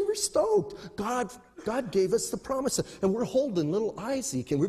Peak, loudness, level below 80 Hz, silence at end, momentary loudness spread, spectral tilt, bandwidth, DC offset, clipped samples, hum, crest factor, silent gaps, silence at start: -12 dBFS; -29 LUFS; -58 dBFS; 0 s; 7 LU; -4.5 dB/octave; 13.5 kHz; under 0.1%; under 0.1%; none; 16 dB; none; 0 s